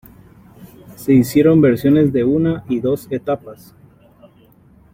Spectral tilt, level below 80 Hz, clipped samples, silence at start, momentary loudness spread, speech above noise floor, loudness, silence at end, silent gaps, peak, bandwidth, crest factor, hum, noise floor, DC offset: -8 dB/octave; -48 dBFS; under 0.1%; 0.6 s; 11 LU; 34 dB; -15 LUFS; 1.4 s; none; -2 dBFS; 16.5 kHz; 16 dB; none; -49 dBFS; under 0.1%